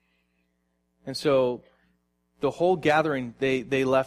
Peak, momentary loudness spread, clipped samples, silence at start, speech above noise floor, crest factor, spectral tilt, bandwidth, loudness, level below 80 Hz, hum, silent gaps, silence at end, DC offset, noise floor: -10 dBFS; 12 LU; under 0.1%; 1.05 s; 49 dB; 18 dB; -6 dB/octave; 15 kHz; -25 LUFS; -62 dBFS; 60 Hz at -60 dBFS; none; 0 s; under 0.1%; -73 dBFS